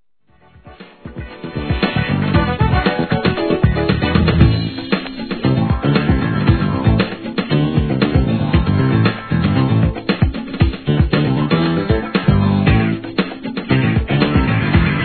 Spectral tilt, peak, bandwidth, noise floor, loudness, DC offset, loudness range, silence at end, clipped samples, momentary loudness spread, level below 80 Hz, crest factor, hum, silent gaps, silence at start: -10.5 dB/octave; 0 dBFS; 4.6 kHz; -53 dBFS; -16 LUFS; 0.2%; 1 LU; 0 s; under 0.1%; 7 LU; -26 dBFS; 16 dB; none; none; 0.65 s